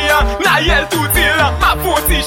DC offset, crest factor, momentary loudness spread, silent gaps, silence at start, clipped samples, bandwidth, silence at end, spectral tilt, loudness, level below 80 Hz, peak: under 0.1%; 12 dB; 3 LU; none; 0 s; under 0.1%; 17 kHz; 0 s; -3.5 dB/octave; -12 LUFS; -20 dBFS; 0 dBFS